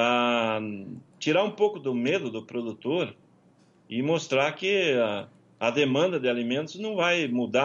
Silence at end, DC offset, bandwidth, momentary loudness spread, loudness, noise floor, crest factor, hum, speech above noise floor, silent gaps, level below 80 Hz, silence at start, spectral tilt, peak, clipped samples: 0 s; under 0.1%; 7.6 kHz; 10 LU; -26 LUFS; -60 dBFS; 16 dB; none; 34 dB; none; -74 dBFS; 0 s; -5 dB/octave; -10 dBFS; under 0.1%